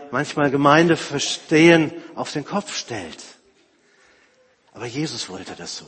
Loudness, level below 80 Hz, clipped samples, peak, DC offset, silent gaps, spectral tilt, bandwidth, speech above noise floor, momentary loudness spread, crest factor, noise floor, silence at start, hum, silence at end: -19 LUFS; -60 dBFS; under 0.1%; 0 dBFS; under 0.1%; none; -4.5 dB/octave; 8.8 kHz; 38 dB; 18 LU; 20 dB; -58 dBFS; 0 s; none; 0.05 s